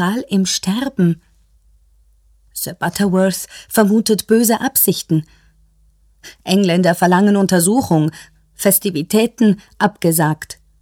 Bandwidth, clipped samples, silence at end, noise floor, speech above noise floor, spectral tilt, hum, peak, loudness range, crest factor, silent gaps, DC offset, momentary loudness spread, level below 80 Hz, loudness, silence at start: 18.5 kHz; under 0.1%; 0.3 s; -53 dBFS; 38 dB; -5 dB/octave; none; 0 dBFS; 5 LU; 16 dB; none; under 0.1%; 9 LU; -52 dBFS; -15 LUFS; 0 s